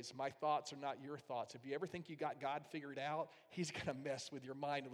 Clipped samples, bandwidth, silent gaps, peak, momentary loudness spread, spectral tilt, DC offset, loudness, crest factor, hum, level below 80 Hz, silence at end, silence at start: under 0.1%; 15.5 kHz; none; -28 dBFS; 7 LU; -4.5 dB/octave; under 0.1%; -45 LUFS; 18 dB; none; -80 dBFS; 0 s; 0 s